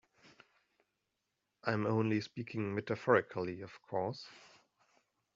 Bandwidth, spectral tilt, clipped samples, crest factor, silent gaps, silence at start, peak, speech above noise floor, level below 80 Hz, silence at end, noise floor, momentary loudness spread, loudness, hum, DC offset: 7.6 kHz; -5.5 dB/octave; under 0.1%; 24 dB; none; 1.65 s; -14 dBFS; 50 dB; -78 dBFS; 0.95 s; -86 dBFS; 12 LU; -36 LUFS; none; under 0.1%